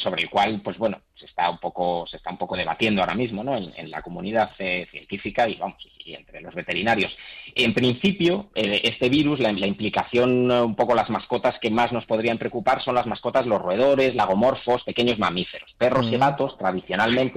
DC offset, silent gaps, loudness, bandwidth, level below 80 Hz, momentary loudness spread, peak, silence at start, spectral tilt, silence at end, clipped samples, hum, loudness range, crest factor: under 0.1%; none; -23 LUFS; 12.5 kHz; -54 dBFS; 12 LU; -10 dBFS; 0 s; -6 dB/octave; 0 s; under 0.1%; none; 5 LU; 14 dB